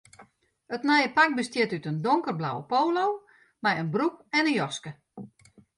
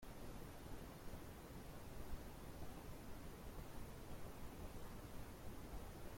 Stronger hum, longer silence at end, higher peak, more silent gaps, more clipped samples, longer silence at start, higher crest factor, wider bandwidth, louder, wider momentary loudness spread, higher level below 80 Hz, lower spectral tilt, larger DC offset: neither; first, 0.5 s vs 0 s; first, -8 dBFS vs -36 dBFS; neither; neither; first, 0.2 s vs 0 s; about the same, 20 dB vs 16 dB; second, 11.5 kHz vs 16.5 kHz; first, -26 LUFS vs -56 LUFS; first, 15 LU vs 1 LU; second, -72 dBFS vs -58 dBFS; about the same, -5 dB/octave vs -5.5 dB/octave; neither